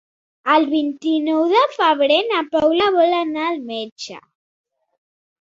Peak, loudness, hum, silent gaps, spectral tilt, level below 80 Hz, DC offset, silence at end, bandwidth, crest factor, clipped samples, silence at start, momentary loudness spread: -2 dBFS; -17 LUFS; none; 3.92-3.96 s; -3.5 dB/octave; -62 dBFS; under 0.1%; 1.25 s; 7.8 kHz; 18 dB; under 0.1%; 0.45 s; 12 LU